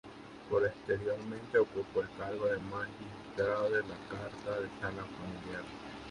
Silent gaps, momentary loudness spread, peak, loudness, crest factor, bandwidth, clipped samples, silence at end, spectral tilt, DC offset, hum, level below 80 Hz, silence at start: none; 12 LU; -16 dBFS; -36 LUFS; 20 dB; 11 kHz; under 0.1%; 0 s; -6.5 dB/octave; under 0.1%; none; -62 dBFS; 0.05 s